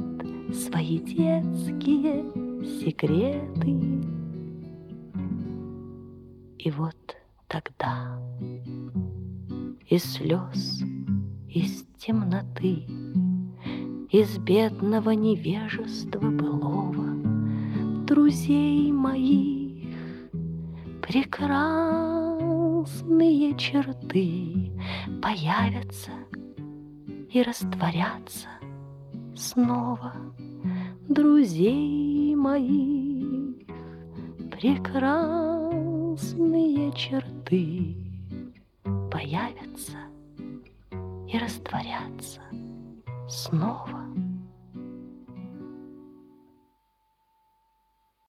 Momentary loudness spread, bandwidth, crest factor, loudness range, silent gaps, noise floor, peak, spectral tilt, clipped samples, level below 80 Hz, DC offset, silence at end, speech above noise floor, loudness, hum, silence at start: 19 LU; 15 kHz; 18 dB; 10 LU; none; -70 dBFS; -8 dBFS; -6.5 dB/octave; under 0.1%; -58 dBFS; under 0.1%; 2.1 s; 45 dB; -27 LUFS; none; 0 s